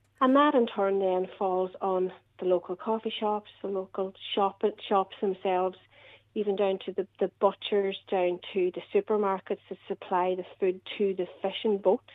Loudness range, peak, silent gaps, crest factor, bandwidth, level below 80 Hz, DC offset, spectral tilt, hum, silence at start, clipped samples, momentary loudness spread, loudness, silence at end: 2 LU; -10 dBFS; none; 20 dB; 4.1 kHz; -78 dBFS; under 0.1%; -8 dB/octave; none; 0.2 s; under 0.1%; 8 LU; -29 LUFS; 0.15 s